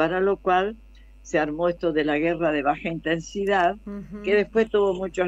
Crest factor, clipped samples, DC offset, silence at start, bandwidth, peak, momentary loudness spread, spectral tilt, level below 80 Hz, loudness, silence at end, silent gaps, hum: 16 dB; under 0.1%; under 0.1%; 0 s; 8 kHz; -8 dBFS; 6 LU; -6 dB/octave; -48 dBFS; -24 LUFS; 0 s; none; none